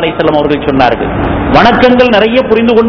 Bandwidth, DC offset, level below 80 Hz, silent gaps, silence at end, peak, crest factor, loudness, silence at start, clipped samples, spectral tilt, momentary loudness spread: 5.4 kHz; under 0.1%; -26 dBFS; none; 0 s; 0 dBFS; 8 dB; -8 LUFS; 0 s; 5%; -7 dB/octave; 6 LU